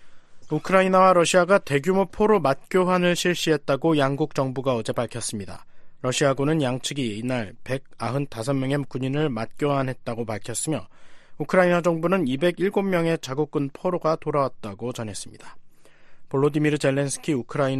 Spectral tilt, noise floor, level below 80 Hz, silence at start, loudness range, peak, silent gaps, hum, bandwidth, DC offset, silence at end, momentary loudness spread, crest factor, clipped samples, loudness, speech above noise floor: -5.5 dB/octave; -45 dBFS; -54 dBFS; 0 s; 7 LU; -4 dBFS; none; none; 13 kHz; under 0.1%; 0 s; 12 LU; 20 dB; under 0.1%; -23 LUFS; 22 dB